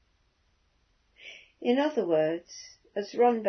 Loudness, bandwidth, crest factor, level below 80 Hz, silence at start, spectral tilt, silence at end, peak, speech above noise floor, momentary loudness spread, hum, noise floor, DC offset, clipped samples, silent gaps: -28 LUFS; 6.4 kHz; 18 dB; -74 dBFS; 1.25 s; -5 dB/octave; 0 s; -12 dBFS; 43 dB; 21 LU; none; -70 dBFS; under 0.1%; under 0.1%; none